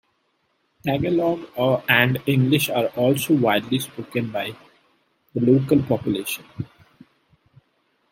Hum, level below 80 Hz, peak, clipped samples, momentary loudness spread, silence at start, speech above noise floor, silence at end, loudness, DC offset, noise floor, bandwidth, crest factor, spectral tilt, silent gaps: none; -58 dBFS; -2 dBFS; under 0.1%; 13 LU; 0.85 s; 48 dB; 1.45 s; -21 LUFS; under 0.1%; -69 dBFS; 16.5 kHz; 22 dB; -5.5 dB/octave; none